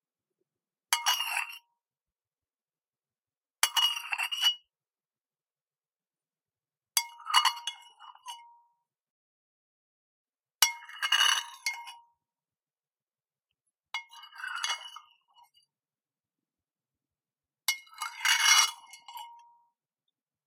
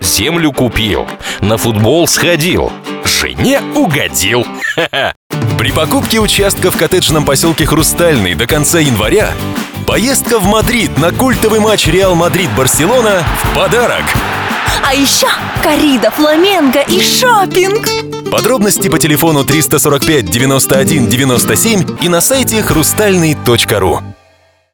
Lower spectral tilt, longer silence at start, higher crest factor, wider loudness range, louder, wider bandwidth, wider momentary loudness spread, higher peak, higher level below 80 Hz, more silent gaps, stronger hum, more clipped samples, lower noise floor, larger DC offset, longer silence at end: second, 8 dB/octave vs -3.5 dB/octave; first, 0.9 s vs 0 s; first, 32 dB vs 10 dB; first, 12 LU vs 2 LU; second, -27 LUFS vs -10 LUFS; second, 16.5 kHz vs over 20 kHz; first, 23 LU vs 5 LU; about the same, -2 dBFS vs 0 dBFS; second, under -90 dBFS vs -28 dBFS; first, 9.10-10.25 s vs 5.16-5.30 s; neither; neither; first, under -90 dBFS vs -49 dBFS; neither; first, 1.1 s vs 0.6 s